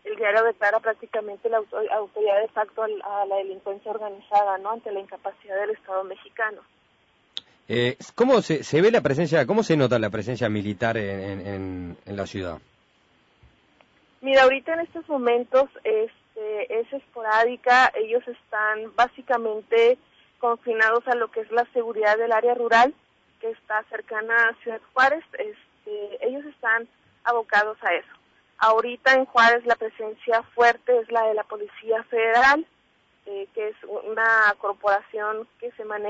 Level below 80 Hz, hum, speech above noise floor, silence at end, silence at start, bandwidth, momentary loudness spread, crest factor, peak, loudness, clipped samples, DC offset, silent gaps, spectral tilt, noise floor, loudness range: -64 dBFS; none; 41 dB; 0 s; 0.05 s; 8 kHz; 15 LU; 16 dB; -8 dBFS; -23 LUFS; under 0.1%; under 0.1%; none; -5 dB/octave; -64 dBFS; 7 LU